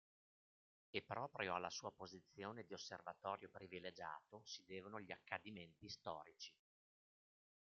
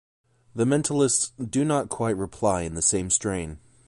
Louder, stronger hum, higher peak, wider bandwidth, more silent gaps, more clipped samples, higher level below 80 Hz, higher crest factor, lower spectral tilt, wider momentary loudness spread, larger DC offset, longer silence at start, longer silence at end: second, -52 LUFS vs -24 LUFS; neither; second, -28 dBFS vs -8 dBFS; second, 7.2 kHz vs 11.5 kHz; neither; neither; second, -88 dBFS vs -48 dBFS; first, 26 dB vs 18 dB; second, -2 dB/octave vs -4.5 dB/octave; first, 11 LU vs 8 LU; neither; first, 0.95 s vs 0.55 s; first, 1.25 s vs 0.3 s